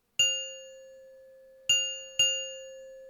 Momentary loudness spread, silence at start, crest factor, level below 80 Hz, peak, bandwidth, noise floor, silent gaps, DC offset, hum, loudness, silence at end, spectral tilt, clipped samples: 20 LU; 0.2 s; 18 dB; -74 dBFS; -14 dBFS; 18.5 kHz; -54 dBFS; none; under 0.1%; none; -27 LUFS; 0 s; 2.5 dB/octave; under 0.1%